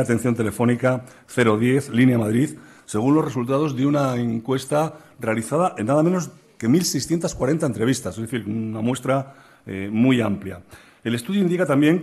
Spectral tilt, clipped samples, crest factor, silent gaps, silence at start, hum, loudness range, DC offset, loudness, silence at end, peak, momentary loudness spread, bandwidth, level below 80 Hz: -6 dB/octave; under 0.1%; 16 dB; none; 0 s; none; 3 LU; under 0.1%; -21 LUFS; 0 s; -6 dBFS; 10 LU; 13 kHz; -54 dBFS